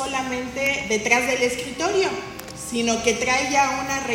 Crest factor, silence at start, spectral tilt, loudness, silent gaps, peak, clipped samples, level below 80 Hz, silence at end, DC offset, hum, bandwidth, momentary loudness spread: 20 dB; 0 s; -2.5 dB/octave; -22 LUFS; none; -2 dBFS; under 0.1%; -50 dBFS; 0 s; under 0.1%; none; 16.5 kHz; 9 LU